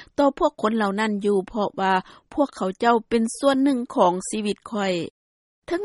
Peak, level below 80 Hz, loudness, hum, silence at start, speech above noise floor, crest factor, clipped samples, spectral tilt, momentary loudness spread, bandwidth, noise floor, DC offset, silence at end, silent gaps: -6 dBFS; -56 dBFS; -23 LUFS; none; 0 s; over 68 dB; 18 dB; under 0.1%; -5 dB/octave; 7 LU; 11.5 kHz; under -90 dBFS; under 0.1%; 0 s; 5.10-5.62 s